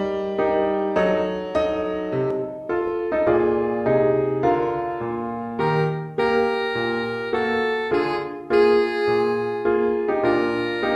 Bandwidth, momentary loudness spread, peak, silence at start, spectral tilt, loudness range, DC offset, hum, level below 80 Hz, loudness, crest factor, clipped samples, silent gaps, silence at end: 8 kHz; 6 LU; -6 dBFS; 0 s; -7.5 dB/octave; 2 LU; under 0.1%; none; -52 dBFS; -22 LUFS; 14 dB; under 0.1%; none; 0 s